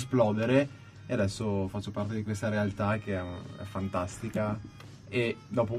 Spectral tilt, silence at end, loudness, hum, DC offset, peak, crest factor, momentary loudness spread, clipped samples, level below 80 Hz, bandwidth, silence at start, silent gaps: -6.5 dB/octave; 0 s; -31 LUFS; none; under 0.1%; -12 dBFS; 18 dB; 13 LU; under 0.1%; -58 dBFS; 13 kHz; 0 s; none